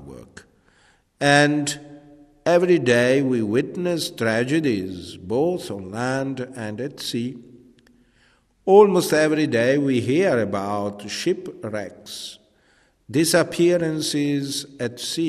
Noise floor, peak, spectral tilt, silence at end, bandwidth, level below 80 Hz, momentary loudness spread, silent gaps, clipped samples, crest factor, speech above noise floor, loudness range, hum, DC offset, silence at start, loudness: -60 dBFS; -2 dBFS; -5 dB/octave; 0 s; 14 kHz; -60 dBFS; 15 LU; none; under 0.1%; 20 dB; 39 dB; 7 LU; none; under 0.1%; 0 s; -21 LUFS